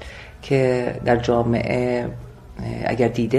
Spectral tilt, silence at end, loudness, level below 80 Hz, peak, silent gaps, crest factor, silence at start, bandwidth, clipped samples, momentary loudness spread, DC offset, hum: -7.5 dB/octave; 0 s; -21 LUFS; -42 dBFS; -4 dBFS; none; 18 dB; 0 s; 11.5 kHz; under 0.1%; 19 LU; under 0.1%; none